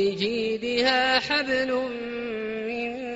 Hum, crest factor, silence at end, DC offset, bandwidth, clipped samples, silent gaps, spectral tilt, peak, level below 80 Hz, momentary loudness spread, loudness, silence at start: none; 18 dB; 0 s; under 0.1%; 8 kHz; under 0.1%; none; -1 dB/octave; -8 dBFS; -58 dBFS; 10 LU; -25 LUFS; 0 s